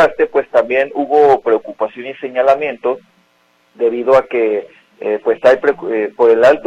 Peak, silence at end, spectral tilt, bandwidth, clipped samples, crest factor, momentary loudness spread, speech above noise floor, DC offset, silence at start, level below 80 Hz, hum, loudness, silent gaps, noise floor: 0 dBFS; 0.05 s; -5.5 dB/octave; 8 kHz; under 0.1%; 14 dB; 11 LU; 43 dB; under 0.1%; 0 s; -56 dBFS; none; -14 LUFS; none; -56 dBFS